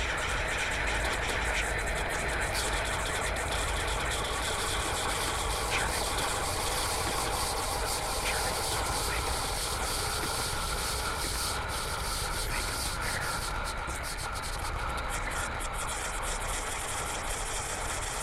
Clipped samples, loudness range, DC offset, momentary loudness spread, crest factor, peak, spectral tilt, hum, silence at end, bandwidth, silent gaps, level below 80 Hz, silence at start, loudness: under 0.1%; 3 LU; under 0.1%; 4 LU; 16 dB; -16 dBFS; -2 dB/octave; none; 0 s; 16 kHz; none; -38 dBFS; 0 s; -31 LUFS